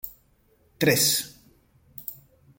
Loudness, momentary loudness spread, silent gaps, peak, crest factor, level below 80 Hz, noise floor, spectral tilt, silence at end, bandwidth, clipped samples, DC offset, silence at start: -22 LUFS; 20 LU; none; -6 dBFS; 22 dB; -62 dBFS; -63 dBFS; -2.5 dB/octave; 0.45 s; 17 kHz; under 0.1%; under 0.1%; 0.05 s